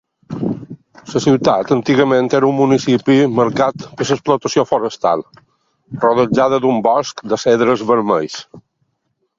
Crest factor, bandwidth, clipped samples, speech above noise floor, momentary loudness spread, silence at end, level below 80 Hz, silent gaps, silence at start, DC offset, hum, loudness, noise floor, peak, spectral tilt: 16 dB; 7.6 kHz; under 0.1%; 54 dB; 10 LU; 0.8 s; -54 dBFS; none; 0.3 s; under 0.1%; none; -15 LUFS; -68 dBFS; 0 dBFS; -6 dB/octave